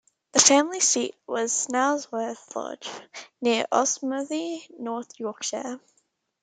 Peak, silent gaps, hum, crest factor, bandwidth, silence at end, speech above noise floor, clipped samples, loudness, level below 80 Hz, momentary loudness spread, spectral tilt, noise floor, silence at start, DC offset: 0 dBFS; none; none; 26 dB; 10.5 kHz; 0.65 s; 45 dB; under 0.1%; -24 LUFS; -78 dBFS; 18 LU; -0.5 dB/octave; -71 dBFS; 0.35 s; under 0.1%